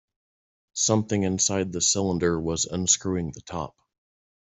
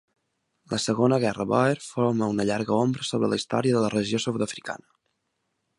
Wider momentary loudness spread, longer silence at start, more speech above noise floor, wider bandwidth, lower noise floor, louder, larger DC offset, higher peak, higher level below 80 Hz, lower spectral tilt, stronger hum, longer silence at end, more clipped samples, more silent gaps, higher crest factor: first, 13 LU vs 8 LU; about the same, 0.75 s vs 0.7 s; first, over 65 dB vs 53 dB; second, 8.4 kHz vs 11.5 kHz; first, under -90 dBFS vs -77 dBFS; about the same, -24 LUFS vs -25 LUFS; neither; about the same, -6 dBFS vs -6 dBFS; first, -56 dBFS vs -62 dBFS; second, -3.5 dB/octave vs -5.5 dB/octave; neither; second, 0.9 s vs 1.05 s; neither; neither; about the same, 20 dB vs 20 dB